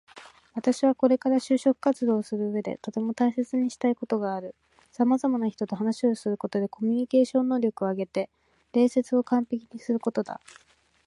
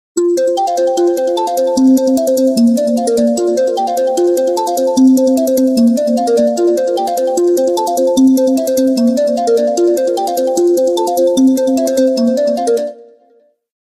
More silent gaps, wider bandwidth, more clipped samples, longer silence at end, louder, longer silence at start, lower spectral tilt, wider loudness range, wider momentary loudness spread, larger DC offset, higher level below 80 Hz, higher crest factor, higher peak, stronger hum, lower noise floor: neither; second, 11.5 kHz vs 15.5 kHz; neither; about the same, 0.7 s vs 0.8 s; second, -26 LUFS vs -12 LUFS; about the same, 0.15 s vs 0.15 s; first, -6.5 dB/octave vs -4.5 dB/octave; about the same, 2 LU vs 1 LU; first, 9 LU vs 5 LU; neither; second, -74 dBFS vs -56 dBFS; first, 18 dB vs 10 dB; second, -8 dBFS vs -2 dBFS; neither; about the same, -49 dBFS vs -52 dBFS